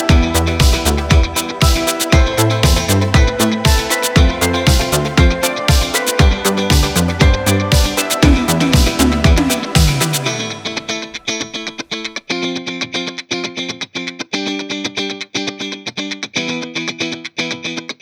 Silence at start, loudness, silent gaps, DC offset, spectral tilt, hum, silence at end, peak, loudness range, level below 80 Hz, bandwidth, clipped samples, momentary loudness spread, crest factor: 0 s; -15 LUFS; none; under 0.1%; -4.5 dB/octave; none; 0.1 s; 0 dBFS; 8 LU; -20 dBFS; 20 kHz; under 0.1%; 10 LU; 14 dB